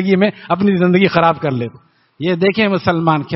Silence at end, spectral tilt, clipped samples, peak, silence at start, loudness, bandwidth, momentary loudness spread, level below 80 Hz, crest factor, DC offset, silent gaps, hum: 0 s; -5 dB/octave; under 0.1%; 0 dBFS; 0 s; -15 LUFS; 6 kHz; 9 LU; -52 dBFS; 14 dB; under 0.1%; none; none